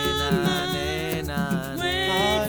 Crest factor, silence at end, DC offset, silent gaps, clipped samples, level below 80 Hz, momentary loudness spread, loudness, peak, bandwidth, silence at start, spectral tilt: 14 dB; 0 s; 0.1%; none; under 0.1%; -40 dBFS; 5 LU; -24 LUFS; -10 dBFS; over 20 kHz; 0 s; -4.5 dB/octave